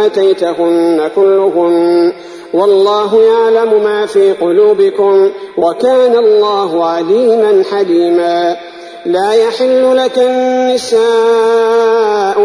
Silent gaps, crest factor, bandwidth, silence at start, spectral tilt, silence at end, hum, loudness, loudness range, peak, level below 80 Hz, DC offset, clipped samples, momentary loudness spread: none; 10 dB; 11 kHz; 0 s; -5 dB/octave; 0 s; none; -10 LUFS; 2 LU; 0 dBFS; -58 dBFS; under 0.1%; under 0.1%; 5 LU